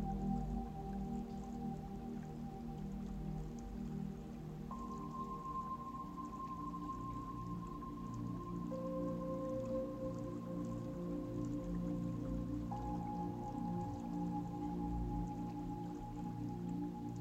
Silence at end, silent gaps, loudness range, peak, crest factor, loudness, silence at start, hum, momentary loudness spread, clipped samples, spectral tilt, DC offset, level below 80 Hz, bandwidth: 0 s; none; 4 LU; -28 dBFS; 16 dB; -44 LUFS; 0 s; none; 5 LU; under 0.1%; -8.5 dB/octave; under 0.1%; -52 dBFS; 15 kHz